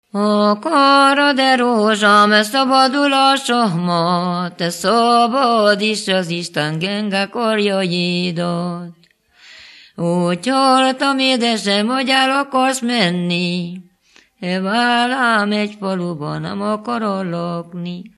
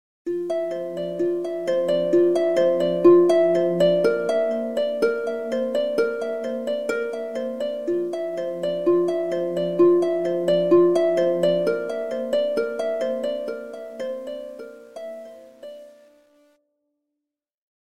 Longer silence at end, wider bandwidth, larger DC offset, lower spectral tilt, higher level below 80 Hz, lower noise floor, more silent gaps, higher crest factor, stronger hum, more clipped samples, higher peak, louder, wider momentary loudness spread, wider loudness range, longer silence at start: second, 0.1 s vs 1.95 s; first, 13 kHz vs 11 kHz; second, under 0.1% vs 0.2%; second, -4.5 dB/octave vs -6.5 dB/octave; about the same, -66 dBFS vs -66 dBFS; second, -53 dBFS vs -85 dBFS; neither; about the same, 16 dB vs 18 dB; neither; neither; first, 0 dBFS vs -4 dBFS; first, -16 LUFS vs -22 LUFS; second, 11 LU vs 15 LU; second, 7 LU vs 13 LU; about the same, 0.15 s vs 0.25 s